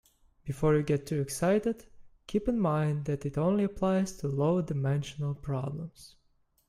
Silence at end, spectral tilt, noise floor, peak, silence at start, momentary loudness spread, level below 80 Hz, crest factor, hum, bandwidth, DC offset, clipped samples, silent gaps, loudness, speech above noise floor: 0.6 s; -7 dB/octave; -70 dBFS; -14 dBFS; 0.45 s; 9 LU; -52 dBFS; 16 dB; none; 14 kHz; under 0.1%; under 0.1%; none; -30 LUFS; 40 dB